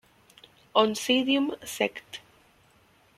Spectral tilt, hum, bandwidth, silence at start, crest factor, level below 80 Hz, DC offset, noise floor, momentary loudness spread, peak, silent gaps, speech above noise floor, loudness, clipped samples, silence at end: -3 dB/octave; none; 16 kHz; 0.75 s; 24 dB; -70 dBFS; under 0.1%; -61 dBFS; 19 LU; -6 dBFS; none; 35 dB; -26 LUFS; under 0.1%; 1 s